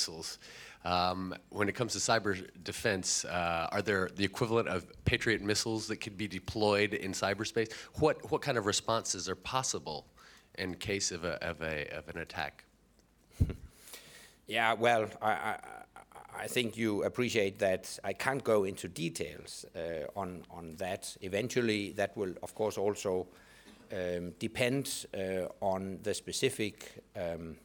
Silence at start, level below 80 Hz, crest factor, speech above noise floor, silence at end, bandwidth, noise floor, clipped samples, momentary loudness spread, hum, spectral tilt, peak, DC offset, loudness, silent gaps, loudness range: 0 s; -56 dBFS; 24 dB; 32 dB; 0.05 s; over 20 kHz; -66 dBFS; under 0.1%; 12 LU; none; -3.5 dB/octave; -12 dBFS; under 0.1%; -34 LUFS; none; 5 LU